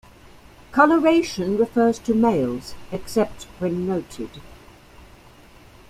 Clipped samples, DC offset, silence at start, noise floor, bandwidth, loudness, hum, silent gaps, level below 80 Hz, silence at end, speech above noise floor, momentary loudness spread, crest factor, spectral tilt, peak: under 0.1%; under 0.1%; 0.7 s; -48 dBFS; 15 kHz; -21 LUFS; none; none; -50 dBFS; 1.35 s; 27 dB; 17 LU; 20 dB; -6 dB/octave; -2 dBFS